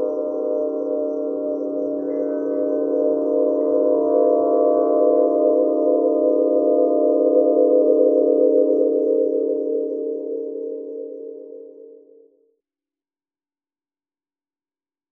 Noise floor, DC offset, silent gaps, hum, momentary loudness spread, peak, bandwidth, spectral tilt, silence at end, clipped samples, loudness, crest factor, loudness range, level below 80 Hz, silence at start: under -90 dBFS; under 0.1%; none; none; 12 LU; -4 dBFS; 1.6 kHz; -10 dB/octave; 3.2 s; under 0.1%; -19 LUFS; 16 dB; 14 LU; -76 dBFS; 0 s